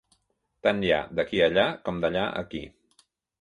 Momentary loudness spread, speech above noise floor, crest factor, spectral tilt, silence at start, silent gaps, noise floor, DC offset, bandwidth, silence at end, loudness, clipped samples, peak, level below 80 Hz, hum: 14 LU; 47 dB; 20 dB; -6 dB/octave; 0.65 s; none; -73 dBFS; under 0.1%; 10.5 kHz; 0.75 s; -26 LUFS; under 0.1%; -8 dBFS; -54 dBFS; none